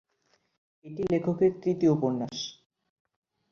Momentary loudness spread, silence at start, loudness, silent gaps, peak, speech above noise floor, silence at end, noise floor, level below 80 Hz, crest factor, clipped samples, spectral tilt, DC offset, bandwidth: 12 LU; 0.85 s; -28 LUFS; none; -12 dBFS; 45 dB; 1 s; -72 dBFS; -64 dBFS; 18 dB; under 0.1%; -7 dB/octave; under 0.1%; 7 kHz